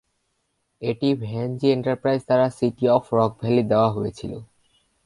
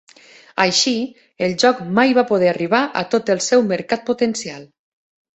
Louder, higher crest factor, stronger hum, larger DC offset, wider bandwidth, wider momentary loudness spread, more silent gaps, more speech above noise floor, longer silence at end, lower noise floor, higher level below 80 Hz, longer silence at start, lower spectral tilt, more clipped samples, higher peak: second, -22 LUFS vs -17 LUFS; about the same, 18 dB vs 18 dB; neither; neither; first, 11.5 kHz vs 8.2 kHz; about the same, 10 LU vs 11 LU; neither; first, 51 dB vs 29 dB; second, 0.6 s vs 0.75 s; first, -73 dBFS vs -47 dBFS; first, -56 dBFS vs -62 dBFS; first, 0.8 s vs 0.55 s; first, -8 dB/octave vs -3.5 dB/octave; neither; about the same, -4 dBFS vs -2 dBFS